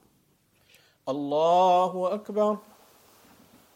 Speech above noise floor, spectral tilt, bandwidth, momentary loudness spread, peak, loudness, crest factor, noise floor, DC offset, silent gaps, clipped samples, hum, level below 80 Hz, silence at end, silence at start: 42 dB; -6 dB/octave; 16.5 kHz; 14 LU; -12 dBFS; -25 LUFS; 16 dB; -66 dBFS; under 0.1%; none; under 0.1%; none; -80 dBFS; 1.15 s; 1.05 s